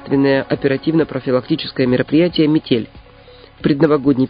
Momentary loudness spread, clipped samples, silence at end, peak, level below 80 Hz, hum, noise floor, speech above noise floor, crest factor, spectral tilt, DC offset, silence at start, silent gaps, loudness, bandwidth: 6 LU; under 0.1%; 0 s; 0 dBFS; -46 dBFS; none; -42 dBFS; 27 dB; 16 dB; -10 dB/octave; under 0.1%; 0 s; none; -16 LUFS; 5.2 kHz